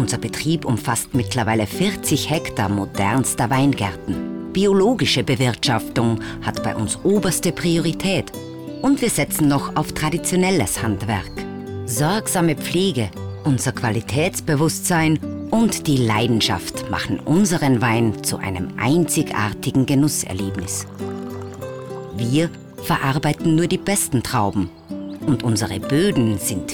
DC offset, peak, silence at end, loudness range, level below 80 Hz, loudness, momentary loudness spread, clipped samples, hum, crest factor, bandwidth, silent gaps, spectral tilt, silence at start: under 0.1%; -8 dBFS; 0 s; 3 LU; -44 dBFS; -20 LUFS; 9 LU; under 0.1%; none; 10 dB; over 20 kHz; none; -5 dB/octave; 0 s